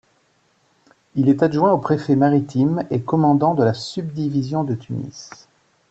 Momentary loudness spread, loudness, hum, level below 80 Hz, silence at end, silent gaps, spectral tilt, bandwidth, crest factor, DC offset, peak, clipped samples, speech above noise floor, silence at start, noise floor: 13 LU; -19 LUFS; none; -58 dBFS; 0.65 s; none; -8 dB/octave; 8 kHz; 16 dB; under 0.1%; -4 dBFS; under 0.1%; 43 dB; 1.15 s; -62 dBFS